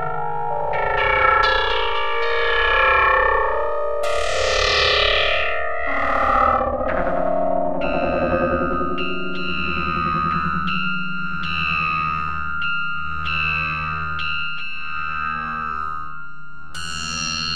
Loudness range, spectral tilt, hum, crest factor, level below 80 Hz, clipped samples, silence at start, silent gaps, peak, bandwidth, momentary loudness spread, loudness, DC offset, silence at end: 6 LU; -4 dB/octave; none; 18 dB; -36 dBFS; under 0.1%; 0 s; none; -4 dBFS; 12.5 kHz; 10 LU; -20 LUFS; 4%; 0 s